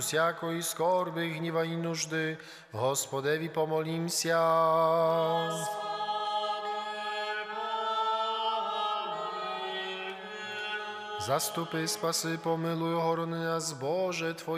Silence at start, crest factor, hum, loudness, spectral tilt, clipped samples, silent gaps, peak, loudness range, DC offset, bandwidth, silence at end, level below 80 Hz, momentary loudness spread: 0 s; 16 dB; none; -31 LUFS; -3.5 dB/octave; under 0.1%; none; -16 dBFS; 5 LU; under 0.1%; 15.5 kHz; 0 s; -80 dBFS; 8 LU